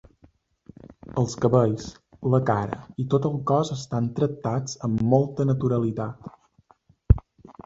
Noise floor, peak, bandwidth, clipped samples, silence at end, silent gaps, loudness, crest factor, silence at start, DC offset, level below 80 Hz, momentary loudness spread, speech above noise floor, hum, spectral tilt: -60 dBFS; -2 dBFS; 7.8 kHz; under 0.1%; 0.45 s; none; -25 LUFS; 22 dB; 0.9 s; under 0.1%; -36 dBFS; 11 LU; 37 dB; none; -7.5 dB/octave